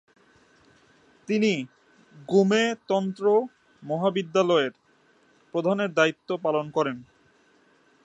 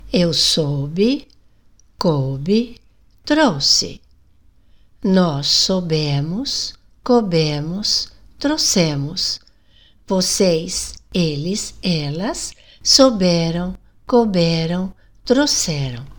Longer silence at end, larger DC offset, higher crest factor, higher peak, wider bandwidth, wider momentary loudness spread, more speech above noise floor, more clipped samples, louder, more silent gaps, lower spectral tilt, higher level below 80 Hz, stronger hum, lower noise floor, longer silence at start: first, 1 s vs 0.05 s; second, under 0.1% vs 0.7%; about the same, 20 dB vs 18 dB; second, -6 dBFS vs 0 dBFS; second, 8.2 kHz vs 19 kHz; about the same, 11 LU vs 11 LU; about the same, 38 dB vs 36 dB; neither; second, -25 LUFS vs -17 LUFS; neither; first, -5.5 dB/octave vs -4 dB/octave; second, -74 dBFS vs -44 dBFS; neither; first, -62 dBFS vs -53 dBFS; first, 1.3 s vs 0 s